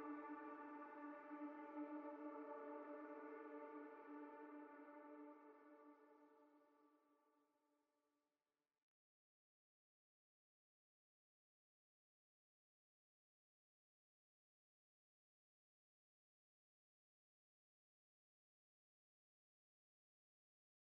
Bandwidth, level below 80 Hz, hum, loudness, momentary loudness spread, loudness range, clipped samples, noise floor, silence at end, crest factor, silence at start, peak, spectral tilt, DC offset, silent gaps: 3.8 kHz; under -90 dBFS; none; -57 LUFS; 10 LU; 11 LU; under 0.1%; under -90 dBFS; 13.5 s; 20 dB; 0 s; -42 dBFS; 2.5 dB/octave; under 0.1%; none